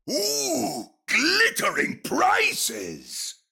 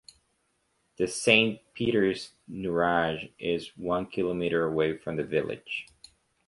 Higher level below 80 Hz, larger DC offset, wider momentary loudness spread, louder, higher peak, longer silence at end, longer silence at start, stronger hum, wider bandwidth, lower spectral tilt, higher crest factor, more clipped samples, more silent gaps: second, -66 dBFS vs -58 dBFS; neither; about the same, 13 LU vs 14 LU; first, -22 LUFS vs -28 LUFS; second, -8 dBFS vs -4 dBFS; second, 0.2 s vs 0.65 s; second, 0.05 s vs 1 s; neither; first, 18 kHz vs 11.5 kHz; second, -1 dB/octave vs -4.5 dB/octave; second, 16 dB vs 24 dB; neither; neither